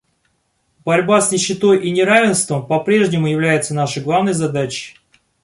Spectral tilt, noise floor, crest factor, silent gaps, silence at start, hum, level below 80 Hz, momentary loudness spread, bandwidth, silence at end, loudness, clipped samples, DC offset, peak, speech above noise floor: -4.5 dB/octave; -65 dBFS; 16 dB; none; 0.85 s; none; -58 dBFS; 8 LU; 11.5 kHz; 0.55 s; -16 LUFS; under 0.1%; under 0.1%; 0 dBFS; 50 dB